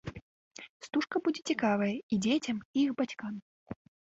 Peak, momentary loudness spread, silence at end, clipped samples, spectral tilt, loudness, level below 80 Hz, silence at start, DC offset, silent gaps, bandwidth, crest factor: -18 dBFS; 19 LU; 0.3 s; under 0.1%; -5 dB/octave; -32 LUFS; -64 dBFS; 0.05 s; under 0.1%; 0.22-0.51 s, 0.69-0.80 s, 2.03-2.09 s, 2.65-2.74 s, 3.42-3.66 s; 8 kHz; 16 dB